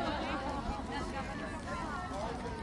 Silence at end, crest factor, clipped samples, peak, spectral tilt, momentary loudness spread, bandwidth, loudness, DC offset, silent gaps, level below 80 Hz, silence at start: 0 s; 16 dB; under 0.1%; -22 dBFS; -5.5 dB/octave; 3 LU; 11.5 kHz; -39 LUFS; under 0.1%; none; -48 dBFS; 0 s